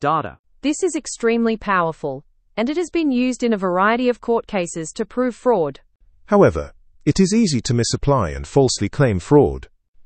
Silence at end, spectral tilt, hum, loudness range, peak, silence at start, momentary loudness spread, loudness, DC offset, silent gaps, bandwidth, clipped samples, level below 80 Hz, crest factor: 0.05 s; -5.5 dB/octave; none; 3 LU; 0 dBFS; 0 s; 11 LU; -19 LUFS; under 0.1%; 0.39-0.44 s, 9.88-9.94 s; 8.8 kHz; under 0.1%; -40 dBFS; 18 dB